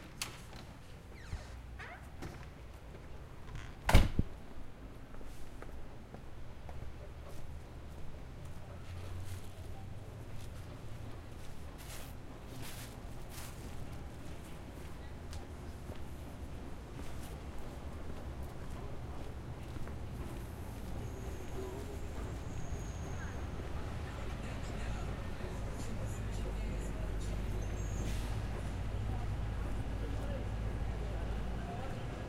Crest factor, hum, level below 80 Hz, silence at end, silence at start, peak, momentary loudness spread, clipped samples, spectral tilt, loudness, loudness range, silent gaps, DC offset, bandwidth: 28 dB; none; -42 dBFS; 0 s; 0 s; -12 dBFS; 11 LU; under 0.1%; -5.5 dB/octave; -44 LUFS; 10 LU; none; under 0.1%; 16 kHz